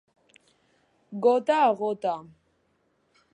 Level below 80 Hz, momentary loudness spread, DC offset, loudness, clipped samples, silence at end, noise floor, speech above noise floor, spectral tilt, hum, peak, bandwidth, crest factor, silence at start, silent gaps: -78 dBFS; 14 LU; under 0.1%; -25 LUFS; under 0.1%; 1.1 s; -70 dBFS; 46 dB; -6 dB/octave; none; -10 dBFS; 9.4 kHz; 18 dB; 1.1 s; none